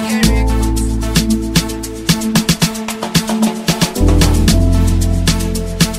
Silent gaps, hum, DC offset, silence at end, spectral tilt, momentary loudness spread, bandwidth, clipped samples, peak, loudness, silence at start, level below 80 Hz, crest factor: none; none; 0.7%; 0 s; -4.5 dB/octave; 5 LU; 16.5 kHz; under 0.1%; 0 dBFS; -14 LUFS; 0 s; -18 dBFS; 14 dB